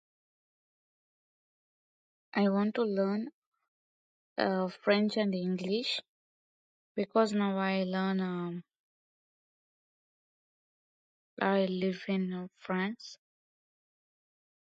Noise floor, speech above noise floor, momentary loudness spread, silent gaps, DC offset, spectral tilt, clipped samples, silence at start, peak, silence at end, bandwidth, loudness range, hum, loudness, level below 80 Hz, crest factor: under -90 dBFS; over 59 dB; 11 LU; 3.33-3.52 s, 3.68-4.36 s, 6.09-6.95 s, 8.79-11.37 s; under 0.1%; -6.5 dB/octave; under 0.1%; 2.35 s; -14 dBFS; 1.65 s; 8 kHz; 6 LU; none; -32 LUFS; -82 dBFS; 22 dB